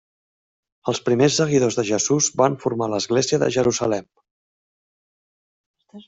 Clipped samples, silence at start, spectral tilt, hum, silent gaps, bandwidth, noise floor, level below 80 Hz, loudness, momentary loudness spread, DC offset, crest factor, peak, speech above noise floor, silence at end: under 0.1%; 0.85 s; -4 dB/octave; none; 4.31-5.74 s; 8.2 kHz; under -90 dBFS; -60 dBFS; -20 LUFS; 7 LU; under 0.1%; 20 dB; -4 dBFS; over 70 dB; 0.05 s